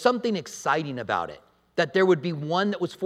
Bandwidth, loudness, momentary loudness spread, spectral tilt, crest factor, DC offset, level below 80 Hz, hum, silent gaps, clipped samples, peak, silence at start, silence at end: 13 kHz; -26 LUFS; 7 LU; -5.5 dB/octave; 20 dB; under 0.1%; -68 dBFS; none; none; under 0.1%; -6 dBFS; 0 s; 0 s